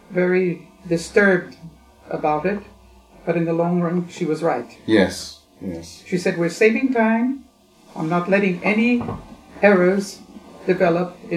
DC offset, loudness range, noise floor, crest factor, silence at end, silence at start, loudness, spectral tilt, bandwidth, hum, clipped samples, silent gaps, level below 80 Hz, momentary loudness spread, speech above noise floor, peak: under 0.1%; 3 LU; -48 dBFS; 20 dB; 0 s; 0.1 s; -20 LUFS; -6.5 dB/octave; 14 kHz; none; under 0.1%; none; -54 dBFS; 16 LU; 28 dB; 0 dBFS